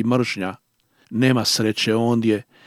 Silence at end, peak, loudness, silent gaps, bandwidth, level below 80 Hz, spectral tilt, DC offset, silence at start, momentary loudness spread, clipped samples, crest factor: 0.25 s; -4 dBFS; -20 LUFS; none; 15.5 kHz; -68 dBFS; -5 dB/octave; under 0.1%; 0 s; 10 LU; under 0.1%; 18 dB